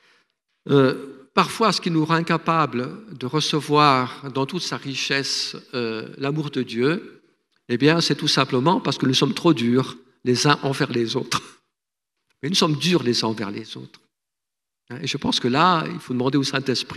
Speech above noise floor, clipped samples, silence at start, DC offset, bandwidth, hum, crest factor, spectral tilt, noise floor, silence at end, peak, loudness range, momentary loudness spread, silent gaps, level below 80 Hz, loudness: 65 dB; under 0.1%; 0.65 s; under 0.1%; 13.5 kHz; none; 22 dB; -4.5 dB/octave; -86 dBFS; 0 s; 0 dBFS; 4 LU; 11 LU; none; -64 dBFS; -21 LUFS